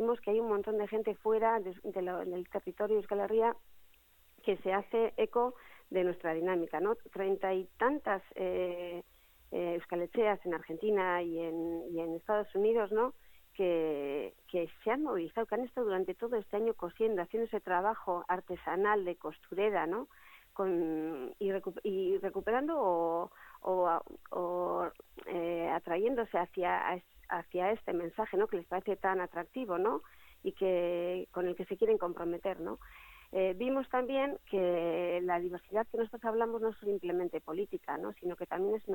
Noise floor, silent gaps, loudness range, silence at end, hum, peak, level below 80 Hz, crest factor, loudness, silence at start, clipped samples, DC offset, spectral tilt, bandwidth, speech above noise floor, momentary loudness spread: -64 dBFS; none; 2 LU; 0 s; none; -16 dBFS; -68 dBFS; 18 dB; -35 LUFS; 0 s; under 0.1%; under 0.1%; -7 dB/octave; 17.5 kHz; 30 dB; 8 LU